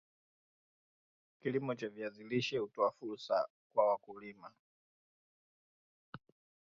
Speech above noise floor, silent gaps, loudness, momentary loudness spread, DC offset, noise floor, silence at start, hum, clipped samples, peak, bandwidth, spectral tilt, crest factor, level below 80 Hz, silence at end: over 53 dB; 3.50-3.70 s, 4.59-6.13 s; -37 LUFS; 23 LU; under 0.1%; under -90 dBFS; 1.45 s; none; under 0.1%; -18 dBFS; 7.2 kHz; -4 dB/octave; 24 dB; -84 dBFS; 0.5 s